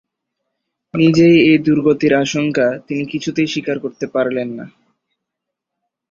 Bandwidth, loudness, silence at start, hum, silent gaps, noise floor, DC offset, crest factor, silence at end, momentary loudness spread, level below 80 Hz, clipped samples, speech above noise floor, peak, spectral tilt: 7.4 kHz; -15 LUFS; 0.95 s; none; none; -80 dBFS; under 0.1%; 16 dB; 1.45 s; 13 LU; -54 dBFS; under 0.1%; 66 dB; -2 dBFS; -6 dB/octave